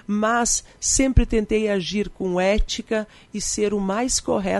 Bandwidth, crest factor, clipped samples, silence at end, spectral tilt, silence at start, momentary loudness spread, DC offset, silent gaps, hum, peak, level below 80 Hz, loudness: 11.5 kHz; 18 dB; under 0.1%; 0 s; -4 dB/octave; 0.1 s; 7 LU; under 0.1%; none; none; -4 dBFS; -30 dBFS; -22 LUFS